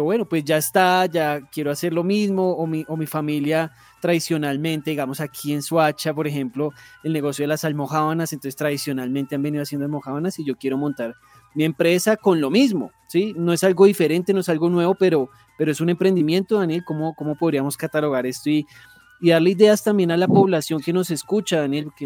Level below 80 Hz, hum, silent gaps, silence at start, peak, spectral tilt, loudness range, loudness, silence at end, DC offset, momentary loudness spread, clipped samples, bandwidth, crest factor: -68 dBFS; none; none; 0 s; -2 dBFS; -5.5 dB/octave; 5 LU; -21 LUFS; 0 s; under 0.1%; 10 LU; under 0.1%; 19 kHz; 18 dB